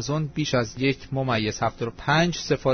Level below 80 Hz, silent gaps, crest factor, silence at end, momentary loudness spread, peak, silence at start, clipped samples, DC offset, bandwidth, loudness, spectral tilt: -46 dBFS; none; 16 dB; 0 s; 6 LU; -8 dBFS; 0 s; under 0.1%; under 0.1%; 6.6 kHz; -25 LUFS; -5 dB/octave